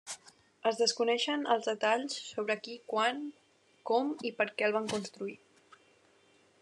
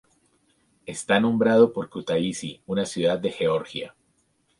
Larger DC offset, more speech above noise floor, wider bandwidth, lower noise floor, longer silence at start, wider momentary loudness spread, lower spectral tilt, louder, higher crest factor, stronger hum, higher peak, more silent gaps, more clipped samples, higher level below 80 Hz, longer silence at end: neither; second, 34 dB vs 45 dB; about the same, 11.5 kHz vs 11.5 kHz; about the same, -66 dBFS vs -68 dBFS; second, 0.05 s vs 0.85 s; second, 13 LU vs 16 LU; second, -2.5 dB/octave vs -5 dB/octave; second, -32 LUFS vs -24 LUFS; about the same, 20 dB vs 20 dB; neither; second, -14 dBFS vs -4 dBFS; neither; neither; second, -86 dBFS vs -62 dBFS; first, 1.25 s vs 0.7 s